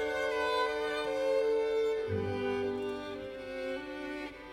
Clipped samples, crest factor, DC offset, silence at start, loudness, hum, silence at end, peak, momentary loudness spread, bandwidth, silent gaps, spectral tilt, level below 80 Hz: under 0.1%; 14 dB; under 0.1%; 0 s; -34 LUFS; none; 0 s; -20 dBFS; 10 LU; 15 kHz; none; -5 dB/octave; -60 dBFS